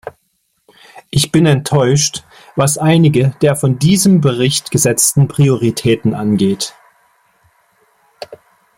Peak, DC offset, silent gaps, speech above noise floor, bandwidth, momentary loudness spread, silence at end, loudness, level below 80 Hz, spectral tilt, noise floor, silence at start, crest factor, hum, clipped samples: 0 dBFS; under 0.1%; none; 52 dB; 16.5 kHz; 14 LU; 0.4 s; -13 LUFS; -48 dBFS; -5 dB/octave; -64 dBFS; 0.05 s; 14 dB; none; under 0.1%